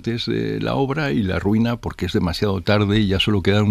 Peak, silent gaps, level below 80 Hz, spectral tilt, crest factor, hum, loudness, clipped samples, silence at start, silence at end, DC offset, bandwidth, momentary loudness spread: -2 dBFS; none; -38 dBFS; -6.5 dB/octave; 16 dB; none; -20 LUFS; under 0.1%; 0 s; 0 s; under 0.1%; 14 kHz; 5 LU